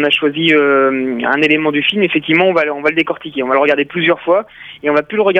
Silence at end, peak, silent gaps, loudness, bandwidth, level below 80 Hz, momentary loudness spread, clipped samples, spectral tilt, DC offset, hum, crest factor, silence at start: 0 s; -2 dBFS; none; -13 LUFS; 9 kHz; -56 dBFS; 6 LU; under 0.1%; -6.5 dB/octave; under 0.1%; none; 12 dB; 0 s